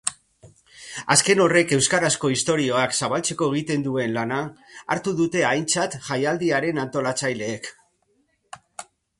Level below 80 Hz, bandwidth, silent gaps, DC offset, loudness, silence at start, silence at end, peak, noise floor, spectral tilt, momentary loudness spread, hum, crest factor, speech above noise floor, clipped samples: -60 dBFS; 12 kHz; none; under 0.1%; -22 LUFS; 0.05 s; 0.35 s; -2 dBFS; -67 dBFS; -3.5 dB/octave; 18 LU; none; 22 dB; 45 dB; under 0.1%